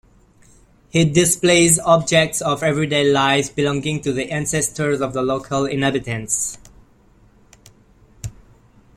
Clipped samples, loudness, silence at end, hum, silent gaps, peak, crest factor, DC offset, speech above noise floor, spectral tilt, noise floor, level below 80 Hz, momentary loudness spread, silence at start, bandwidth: under 0.1%; -18 LUFS; 0.65 s; none; none; 0 dBFS; 20 dB; under 0.1%; 34 dB; -4 dB/octave; -52 dBFS; -48 dBFS; 10 LU; 0.95 s; 15.5 kHz